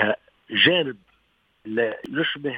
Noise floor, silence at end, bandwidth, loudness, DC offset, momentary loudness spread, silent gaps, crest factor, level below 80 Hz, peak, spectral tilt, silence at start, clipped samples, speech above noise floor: -66 dBFS; 0 s; 5.2 kHz; -22 LUFS; under 0.1%; 13 LU; none; 20 dB; -68 dBFS; -4 dBFS; -6.5 dB/octave; 0 s; under 0.1%; 42 dB